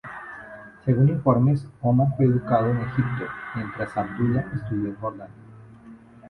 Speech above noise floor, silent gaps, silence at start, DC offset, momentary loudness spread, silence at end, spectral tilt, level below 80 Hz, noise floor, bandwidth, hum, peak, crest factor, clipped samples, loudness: 24 dB; none; 0.05 s; under 0.1%; 18 LU; 0 s; -10.5 dB/octave; -52 dBFS; -47 dBFS; 4.3 kHz; none; -6 dBFS; 18 dB; under 0.1%; -24 LUFS